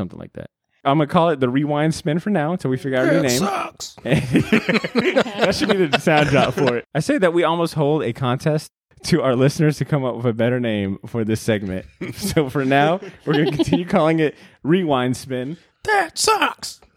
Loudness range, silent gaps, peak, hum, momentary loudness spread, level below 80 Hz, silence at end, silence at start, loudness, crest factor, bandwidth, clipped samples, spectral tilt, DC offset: 3 LU; none; -2 dBFS; none; 10 LU; -50 dBFS; 0.2 s; 0 s; -19 LUFS; 18 dB; 16.5 kHz; under 0.1%; -5.5 dB/octave; under 0.1%